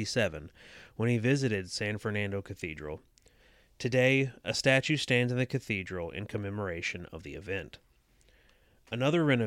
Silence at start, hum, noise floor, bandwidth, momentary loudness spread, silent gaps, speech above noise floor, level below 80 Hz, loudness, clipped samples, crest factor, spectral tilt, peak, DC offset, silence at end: 0 s; none; -65 dBFS; 13.5 kHz; 17 LU; none; 34 dB; -60 dBFS; -31 LUFS; under 0.1%; 20 dB; -5.5 dB/octave; -12 dBFS; under 0.1%; 0 s